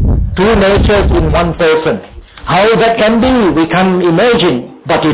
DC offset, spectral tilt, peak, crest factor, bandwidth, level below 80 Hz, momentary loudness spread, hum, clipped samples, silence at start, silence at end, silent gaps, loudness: under 0.1%; -10.5 dB/octave; -2 dBFS; 8 dB; 4 kHz; -20 dBFS; 6 LU; none; under 0.1%; 0 s; 0 s; none; -10 LUFS